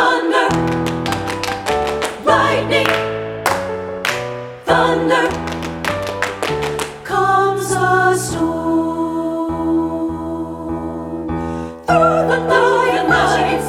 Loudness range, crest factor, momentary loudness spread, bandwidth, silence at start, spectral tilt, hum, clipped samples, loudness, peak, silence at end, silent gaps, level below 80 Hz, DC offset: 3 LU; 16 dB; 10 LU; 16.5 kHz; 0 s; -4.5 dB/octave; none; under 0.1%; -17 LUFS; 0 dBFS; 0 s; none; -40 dBFS; under 0.1%